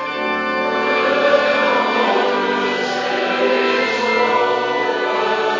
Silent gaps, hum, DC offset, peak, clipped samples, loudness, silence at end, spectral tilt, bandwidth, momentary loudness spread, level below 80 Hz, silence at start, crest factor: none; none; under 0.1%; -2 dBFS; under 0.1%; -17 LUFS; 0 s; -3.5 dB/octave; 7.6 kHz; 5 LU; -64 dBFS; 0 s; 16 dB